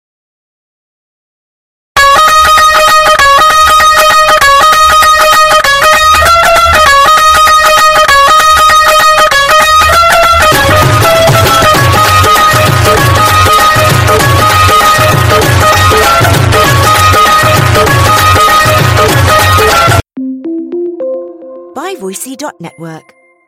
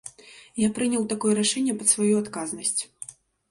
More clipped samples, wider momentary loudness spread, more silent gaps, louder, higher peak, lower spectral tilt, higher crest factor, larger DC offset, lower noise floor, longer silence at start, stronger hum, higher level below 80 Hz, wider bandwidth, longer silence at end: first, 0.6% vs under 0.1%; second, 14 LU vs 17 LU; neither; first, -4 LUFS vs -24 LUFS; first, 0 dBFS vs -6 dBFS; about the same, -3 dB/octave vs -3.5 dB/octave; second, 6 dB vs 20 dB; neither; second, -39 dBFS vs -49 dBFS; first, 1.95 s vs 0.05 s; neither; first, -26 dBFS vs -64 dBFS; first, over 20 kHz vs 11.5 kHz; about the same, 0.5 s vs 0.4 s